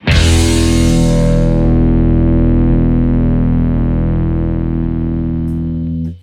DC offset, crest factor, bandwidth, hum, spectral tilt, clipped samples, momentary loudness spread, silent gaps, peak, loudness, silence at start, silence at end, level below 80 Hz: under 0.1%; 12 dB; 14 kHz; none; -6.5 dB/octave; under 0.1%; 6 LU; none; 0 dBFS; -13 LUFS; 0.05 s; 0.05 s; -16 dBFS